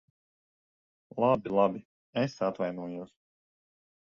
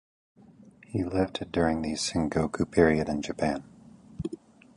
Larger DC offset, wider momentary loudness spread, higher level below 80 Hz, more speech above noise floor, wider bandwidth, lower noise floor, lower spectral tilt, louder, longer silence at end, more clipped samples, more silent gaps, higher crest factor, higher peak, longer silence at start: neither; about the same, 17 LU vs 15 LU; second, -70 dBFS vs -48 dBFS; first, over 61 dB vs 27 dB; second, 7.2 kHz vs 11.5 kHz; first, under -90 dBFS vs -54 dBFS; first, -7.5 dB/octave vs -5.5 dB/octave; about the same, -30 LUFS vs -28 LUFS; first, 1 s vs 0.4 s; neither; first, 1.85-2.13 s vs none; about the same, 22 dB vs 22 dB; second, -12 dBFS vs -8 dBFS; first, 1.15 s vs 0.9 s